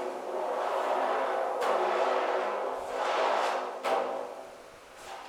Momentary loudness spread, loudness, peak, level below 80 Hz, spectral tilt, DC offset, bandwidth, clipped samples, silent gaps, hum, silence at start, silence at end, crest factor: 17 LU; -30 LUFS; -16 dBFS; -74 dBFS; -2.5 dB/octave; under 0.1%; 17.5 kHz; under 0.1%; none; none; 0 s; 0 s; 16 dB